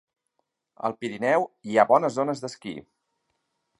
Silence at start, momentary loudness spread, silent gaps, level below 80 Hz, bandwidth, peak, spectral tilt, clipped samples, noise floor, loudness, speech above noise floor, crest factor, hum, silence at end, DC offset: 0.85 s; 17 LU; none; -74 dBFS; 11.5 kHz; -4 dBFS; -5.5 dB/octave; under 0.1%; -77 dBFS; -24 LUFS; 53 dB; 22 dB; none; 1 s; under 0.1%